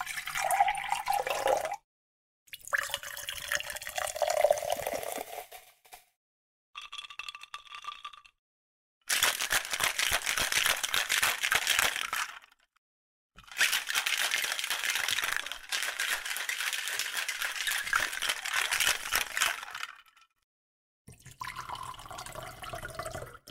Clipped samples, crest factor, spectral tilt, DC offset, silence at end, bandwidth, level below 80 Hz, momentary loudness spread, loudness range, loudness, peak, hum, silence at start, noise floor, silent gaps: under 0.1%; 26 dB; 0.5 dB/octave; under 0.1%; 0 s; 16 kHz; -60 dBFS; 16 LU; 15 LU; -30 LUFS; -8 dBFS; none; 0 s; -56 dBFS; 1.84-2.46 s, 6.16-6.73 s, 8.39-9.01 s, 12.78-13.30 s, 20.43-21.05 s